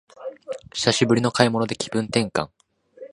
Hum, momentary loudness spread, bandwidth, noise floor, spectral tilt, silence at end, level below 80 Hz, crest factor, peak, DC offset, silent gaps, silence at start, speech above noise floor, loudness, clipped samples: none; 17 LU; 11.5 kHz; -45 dBFS; -4.5 dB/octave; 0.05 s; -56 dBFS; 24 dB; 0 dBFS; under 0.1%; none; 0.2 s; 23 dB; -22 LUFS; under 0.1%